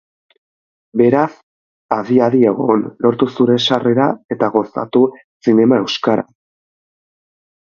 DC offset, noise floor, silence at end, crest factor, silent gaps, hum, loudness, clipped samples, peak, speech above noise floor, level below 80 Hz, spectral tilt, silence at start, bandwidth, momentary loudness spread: under 0.1%; under -90 dBFS; 1.5 s; 16 dB; 1.43-1.89 s, 4.25-4.29 s, 5.24-5.40 s; none; -15 LUFS; under 0.1%; 0 dBFS; over 76 dB; -60 dBFS; -6.5 dB/octave; 0.95 s; 7.2 kHz; 8 LU